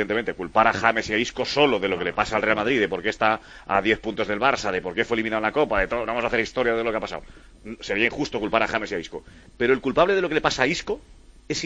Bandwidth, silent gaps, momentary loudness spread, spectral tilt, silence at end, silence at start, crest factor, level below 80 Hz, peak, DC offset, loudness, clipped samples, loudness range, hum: 9.4 kHz; none; 10 LU; -4 dB/octave; 0 s; 0 s; 22 dB; -46 dBFS; -2 dBFS; under 0.1%; -23 LUFS; under 0.1%; 3 LU; none